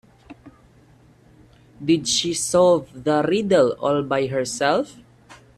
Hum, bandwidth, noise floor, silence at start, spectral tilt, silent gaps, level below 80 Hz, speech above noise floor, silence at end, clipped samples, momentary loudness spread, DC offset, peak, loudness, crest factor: none; 13.5 kHz; -52 dBFS; 0.3 s; -4 dB/octave; none; -56 dBFS; 33 dB; 0.25 s; under 0.1%; 6 LU; under 0.1%; -6 dBFS; -20 LUFS; 16 dB